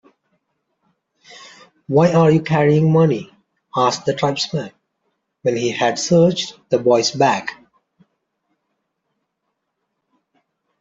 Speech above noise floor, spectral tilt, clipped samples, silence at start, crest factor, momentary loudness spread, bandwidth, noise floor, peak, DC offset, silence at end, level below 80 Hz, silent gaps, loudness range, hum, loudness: 59 dB; -5.5 dB/octave; under 0.1%; 1.4 s; 18 dB; 11 LU; 7.8 kHz; -75 dBFS; -2 dBFS; under 0.1%; 3.3 s; -60 dBFS; none; 5 LU; none; -17 LUFS